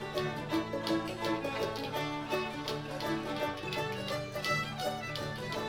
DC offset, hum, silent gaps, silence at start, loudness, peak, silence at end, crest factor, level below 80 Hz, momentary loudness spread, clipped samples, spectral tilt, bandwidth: under 0.1%; none; none; 0 s; -35 LUFS; -18 dBFS; 0 s; 18 dB; -60 dBFS; 4 LU; under 0.1%; -5 dB/octave; 18 kHz